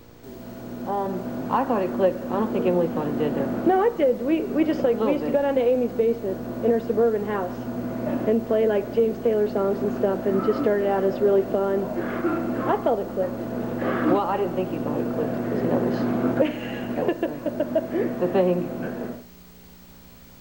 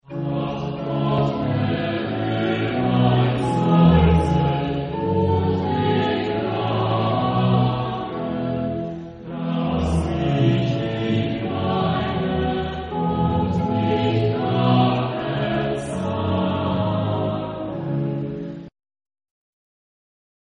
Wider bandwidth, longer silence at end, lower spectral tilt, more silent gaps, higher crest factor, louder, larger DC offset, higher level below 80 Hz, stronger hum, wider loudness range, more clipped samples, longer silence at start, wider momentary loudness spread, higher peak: first, 17 kHz vs 8.8 kHz; second, 0 s vs 1.8 s; about the same, -8 dB/octave vs -8 dB/octave; neither; about the same, 14 dB vs 18 dB; about the same, -24 LUFS vs -22 LUFS; first, 0.1% vs under 0.1%; second, -52 dBFS vs -38 dBFS; neither; about the same, 3 LU vs 5 LU; neither; first, 0.25 s vs 0.1 s; about the same, 8 LU vs 8 LU; second, -8 dBFS vs -4 dBFS